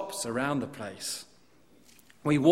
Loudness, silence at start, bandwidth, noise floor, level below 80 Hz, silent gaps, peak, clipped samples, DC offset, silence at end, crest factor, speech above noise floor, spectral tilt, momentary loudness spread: -32 LUFS; 0 s; 16 kHz; -62 dBFS; -66 dBFS; none; -8 dBFS; under 0.1%; under 0.1%; 0 s; 22 dB; 34 dB; -5 dB/octave; 11 LU